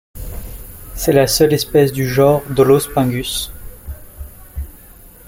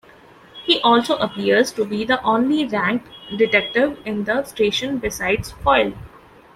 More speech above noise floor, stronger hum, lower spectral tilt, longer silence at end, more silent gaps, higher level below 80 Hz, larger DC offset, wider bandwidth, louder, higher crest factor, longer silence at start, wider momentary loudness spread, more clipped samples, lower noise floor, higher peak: about the same, 27 dB vs 28 dB; neither; about the same, -5 dB/octave vs -4 dB/octave; second, 0.2 s vs 0.5 s; neither; first, -34 dBFS vs -46 dBFS; neither; about the same, 17 kHz vs 15.5 kHz; first, -14 LUFS vs -19 LUFS; about the same, 16 dB vs 18 dB; second, 0.15 s vs 0.55 s; first, 21 LU vs 8 LU; neither; second, -41 dBFS vs -47 dBFS; about the same, -2 dBFS vs -2 dBFS